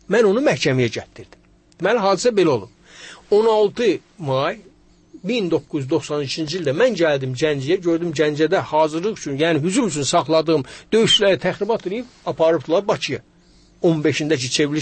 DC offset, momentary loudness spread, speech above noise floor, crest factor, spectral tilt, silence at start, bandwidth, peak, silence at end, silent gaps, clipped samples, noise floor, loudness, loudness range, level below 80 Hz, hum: under 0.1%; 8 LU; 33 dB; 14 dB; -4.5 dB/octave; 0.1 s; 8.8 kHz; -4 dBFS; 0 s; none; under 0.1%; -52 dBFS; -19 LUFS; 3 LU; -56 dBFS; none